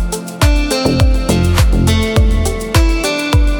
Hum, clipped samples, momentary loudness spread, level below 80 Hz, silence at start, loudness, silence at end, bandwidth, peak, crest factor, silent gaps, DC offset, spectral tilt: none; under 0.1%; 3 LU; -14 dBFS; 0 s; -14 LUFS; 0 s; 19 kHz; 0 dBFS; 12 dB; none; under 0.1%; -5.5 dB/octave